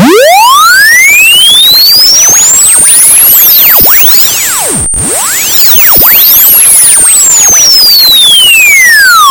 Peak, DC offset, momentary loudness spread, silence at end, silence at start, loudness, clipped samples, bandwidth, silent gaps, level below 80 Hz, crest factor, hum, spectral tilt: 0 dBFS; under 0.1%; 6 LU; 0 s; 0 s; 1 LUFS; 20%; over 20 kHz; none; -32 dBFS; 2 dB; none; 0.5 dB/octave